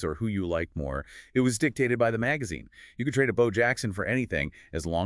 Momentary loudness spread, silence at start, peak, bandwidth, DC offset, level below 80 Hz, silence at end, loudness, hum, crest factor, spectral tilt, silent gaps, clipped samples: 11 LU; 0 s; -10 dBFS; 12 kHz; under 0.1%; -48 dBFS; 0 s; -28 LUFS; none; 18 dB; -5.5 dB/octave; none; under 0.1%